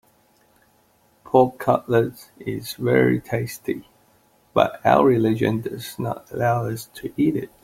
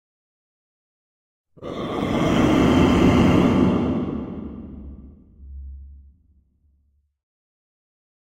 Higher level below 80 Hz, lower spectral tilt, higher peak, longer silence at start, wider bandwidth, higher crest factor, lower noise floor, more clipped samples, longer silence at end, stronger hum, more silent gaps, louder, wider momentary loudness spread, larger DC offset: second, -56 dBFS vs -38 dBFS; about the same, -7 dB/octave vs -7 dB/octave; about the same, -2 dBFS vs -4 dBFS; second, 1.25 s vs 1.6 s; about the same, 16.5 kHz vs 15.5 kHz; about the same, 20 dB vs 20 dB; second, -60 dBFS vs -65 dBFS; neither; second, 0.2 s vs 2.3 s; neither; neither; second, -22 LUFS vs -19 LUFS; second, 13 LU vs 24 LU; neither